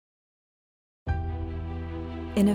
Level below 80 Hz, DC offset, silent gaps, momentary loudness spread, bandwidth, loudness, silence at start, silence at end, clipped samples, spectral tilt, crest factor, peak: -38 dBFS; under 0.1%; none; 7 LU; 16 kHz; -32 LUFS; 1.05 s; 0 s; under 0.1%; -7.5 dB/octave; 20 dB; -12 dBFS